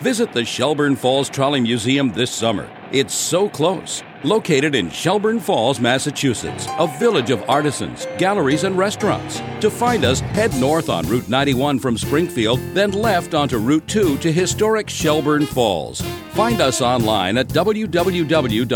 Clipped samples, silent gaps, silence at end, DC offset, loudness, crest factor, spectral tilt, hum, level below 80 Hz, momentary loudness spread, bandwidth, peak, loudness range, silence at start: under 0.1%; none; 0 s; under 0.1%; -18 LUFS; 16 dB; -4.5 dB/octave; none; -44 dBFS; 4 LU; over 20 kHz; -2 dBFS; 1 LU; 0 s